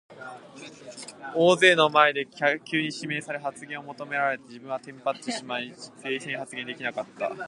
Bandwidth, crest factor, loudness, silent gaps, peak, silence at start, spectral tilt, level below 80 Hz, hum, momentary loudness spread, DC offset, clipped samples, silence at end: 11.5 kHz; 24 dB; -25 LUFS; none; -2 dBFS; 0.1 s; -3.5 dB/octave; -78 dBFS; none; 23 LU; under 0.1%; under 0.1%; 0 s